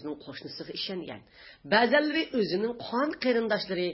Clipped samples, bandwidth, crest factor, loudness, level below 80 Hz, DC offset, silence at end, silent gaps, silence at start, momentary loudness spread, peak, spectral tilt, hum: under 0.1%; 5.8 kHz; 20 dB; -28 LUFS; -66 dBFS; under 0.1%; 0 s; none; 0 s; 17 LU; -8 dBFS; -8.5 dB/octave; none